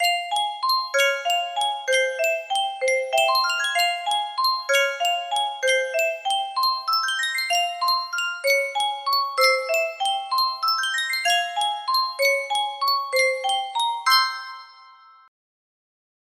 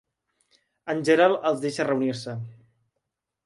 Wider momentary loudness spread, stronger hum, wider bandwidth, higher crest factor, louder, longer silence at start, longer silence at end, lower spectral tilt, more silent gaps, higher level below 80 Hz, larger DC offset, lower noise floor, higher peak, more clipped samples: second, 5 LU vs 18 LU; neither; first, 16 kHz vs 11.5 kHz; about the same, 18 dB vs 20 dB; first, -21 LUFS vs -24 LUFS; second, 0 s vs 0.85 s; first, 1.4 s vs 0.9 s; second, 3.5 dB/octave vs -5.5 dB/octave; neither; second, -78 dBFS vs -72 dBFS; neither; second, -49 dBFS vs -82 dBFS; about the same, -4 dBFS vs -6 dBFS; neither